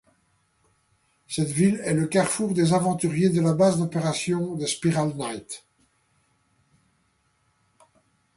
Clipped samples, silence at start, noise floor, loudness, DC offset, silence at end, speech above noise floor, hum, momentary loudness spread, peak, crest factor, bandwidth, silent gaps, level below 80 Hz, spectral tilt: under 0.1%; 1.3 s; -68 dBFS; -24 LUFS; under 0.1%; 2.8 s; 45 dB; none; 11 LU; -8 dBFS; 16 dB; 11.5 kHz; none; -62 dBFS; -5.5 dB/octave